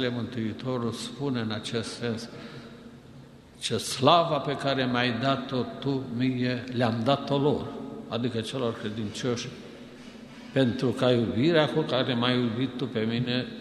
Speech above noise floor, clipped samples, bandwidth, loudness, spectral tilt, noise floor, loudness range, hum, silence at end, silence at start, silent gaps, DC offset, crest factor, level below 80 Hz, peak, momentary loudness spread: 22 dB; under 0.1%; 12.5 kHz; -27 LUFS; -5.5 dB/octave; -49 dBFS; 7 LU; none; 0 s; 0 s; none; under 0.1%; 22 dB; -60 dBFS; -4 dBFS; 17 LU